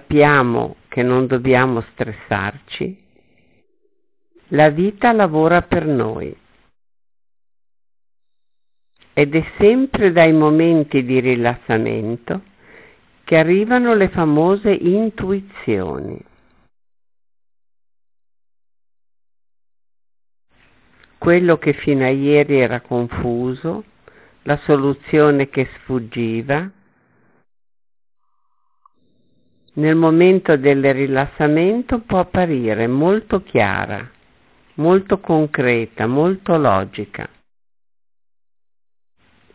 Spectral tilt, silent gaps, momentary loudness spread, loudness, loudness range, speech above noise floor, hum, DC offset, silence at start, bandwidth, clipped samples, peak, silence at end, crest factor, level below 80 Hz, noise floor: -11 dB/octave; none; 13 LU; -16 LUFS; 10 LU; 69 dB; none; under 0.1%; 0.1 s; 4 kHz; under 0.1%; -2 dBFS; 2.3 s; 16 dB; -46 dBFS; -85 dBFS